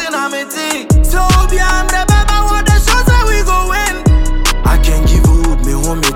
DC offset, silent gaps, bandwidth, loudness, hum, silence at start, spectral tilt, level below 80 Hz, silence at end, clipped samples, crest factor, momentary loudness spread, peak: under 0.1%; none; 16.5 kHz; -12 LUFS; none; 0 s; -4.5 dB/octave; -12 dBFS; 0 s; under 0.1%; 10 dB; 6 LU; 0 dBFS